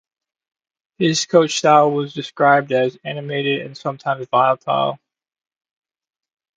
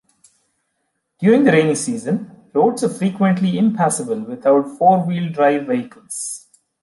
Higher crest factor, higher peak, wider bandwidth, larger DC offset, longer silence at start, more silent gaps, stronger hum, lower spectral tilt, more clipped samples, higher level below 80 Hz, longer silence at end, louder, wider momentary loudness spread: about the same, 20 dB vs 16 dB; about the same, 0 dBFS vs -2 dBFS; second, 9.4 kHz vs 11.5 kHz; neither; second, 1 s vs 1.2 s; neither; neither; second, -4.5 dB/octave vs -6 dB/octave; neither; about the same, -68 dBFS vs -66 dBFS; first, 1.6 s vs 0.45 s; about the same, -18 LUFS vs -17 LUFS; about the same, 11 LU vs 12 LU